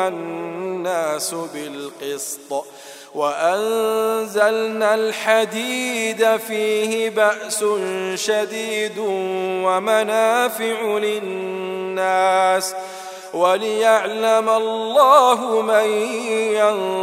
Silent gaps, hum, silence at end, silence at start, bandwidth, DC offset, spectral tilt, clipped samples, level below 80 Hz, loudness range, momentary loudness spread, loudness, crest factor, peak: none; none; 0 s; 0 s; 16 kHz; under 0.1%; -2.5 dB/octave; under 0.1%; -82 dBFS; 6 LU; 11 LU; -19 LUFS; 18 dB; 0 dBFS